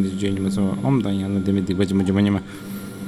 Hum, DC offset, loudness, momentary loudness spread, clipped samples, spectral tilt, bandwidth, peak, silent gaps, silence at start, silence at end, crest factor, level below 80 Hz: none; under 0.1%; -21 LUFS; 10 LU; under 0.1%; -7.5 dB/octave; 13 kHz; -6 dBFS; none; 0 s; 0 s; 14 dB; -50 dBFS